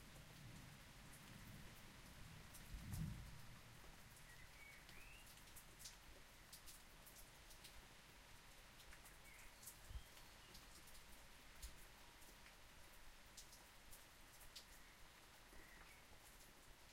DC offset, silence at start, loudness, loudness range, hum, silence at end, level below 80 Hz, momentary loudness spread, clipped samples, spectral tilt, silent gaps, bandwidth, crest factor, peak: under 0.1%; 0 s; -61 LUFS; 5 LU; none; 0 s; -66 dBFS; 5 LU; under 0.1%; -3.5 dB/octave; none; 16 kHz; 22 dB; -40 dBFS